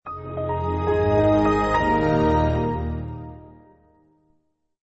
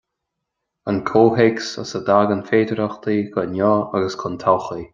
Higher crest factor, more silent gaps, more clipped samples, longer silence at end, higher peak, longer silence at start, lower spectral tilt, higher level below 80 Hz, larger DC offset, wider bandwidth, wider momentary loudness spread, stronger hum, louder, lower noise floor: about the same, 16 dB vs 18 dB; neither; neither; first, 1.4 s vs 0.1 s; second, -8 dBFS vs -2 dBFS; second, 0.05 s vs 0.85 s; first, -8 dB/octave vs -6.5 dB/octave; first, -36 dBFS vs -58 dBFS; neither; about the same, 8 kHz vs 7.6 kHz; first, 14 LU vs 9 LU; neither; about the same, -21 LUFS vs -19 LUFS; second, -68 dBFS vs -79 dBFS